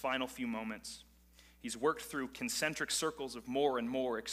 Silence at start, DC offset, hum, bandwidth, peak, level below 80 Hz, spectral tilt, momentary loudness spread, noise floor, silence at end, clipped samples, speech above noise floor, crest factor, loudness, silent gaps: 0 s; under 0.1%; none; 15.5 kHz; -20 dBFS; -66 dBFS; -2.5 dB/octave; 11 LU; -63 dBFS; 0 s; under 0.1%; 26 dB; 18 dB; -37 LUFS; none